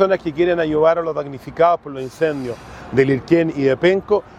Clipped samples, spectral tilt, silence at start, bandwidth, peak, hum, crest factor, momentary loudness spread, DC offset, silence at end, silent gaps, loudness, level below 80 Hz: under 0.1%; -7.5 dB/octave; 0 s; 10.5 kHz; 0 dBFS; none; 18 dB; 12 LU; under 0.1%; 0.1 s; none; -18 LUFS; -48 dBFS